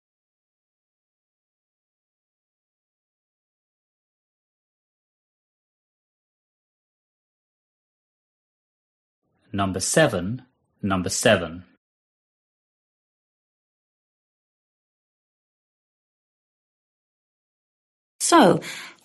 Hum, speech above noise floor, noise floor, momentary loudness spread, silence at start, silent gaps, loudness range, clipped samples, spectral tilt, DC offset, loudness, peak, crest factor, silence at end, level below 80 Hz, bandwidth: none; over 69 dB; under -90 dBFS; 18 LU; 9.55 s; 11.77-18.19 s; 8 LU; under 0.1%; -4 dB/octave; under 0.1%; -20 LUFS; -4 dBFS; 26 dB; 0.15 s; -64 dBFS; 12 kHz